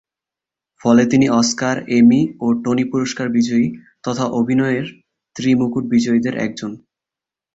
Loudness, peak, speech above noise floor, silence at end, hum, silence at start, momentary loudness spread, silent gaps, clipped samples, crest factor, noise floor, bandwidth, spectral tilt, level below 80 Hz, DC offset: -17 LUFS; -2 dBFS; 71 dB; 0.8 s; none; 0.85 s; 11 LU; none; under 0.1%; 16 dB; -88 dBFS; 8 kHz; -5.5 dB/octave; -56 dBFS; under 0.1%